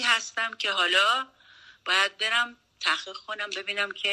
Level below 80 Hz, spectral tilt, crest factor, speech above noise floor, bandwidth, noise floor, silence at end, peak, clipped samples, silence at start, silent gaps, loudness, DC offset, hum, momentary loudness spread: -76 dBFS; 1 dB/octave; 18 dB; 27 dB; 13.5 kHz; -54 dBFS; 0 s; -10 dBFS; under 0.1%; 0 s; none; -25 LUFS; under 0.1%; none; 12 LU